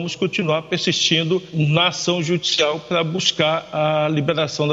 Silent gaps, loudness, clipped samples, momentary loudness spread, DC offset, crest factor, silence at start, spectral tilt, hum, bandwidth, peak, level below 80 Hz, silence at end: none; -19 LUFS; under 0.1%; 5 LU; under 0.1%; 18 dB; 0 s; -4 dB/octave; none; 8 kHz; 0 dBFS; -60 dBFS; 0 s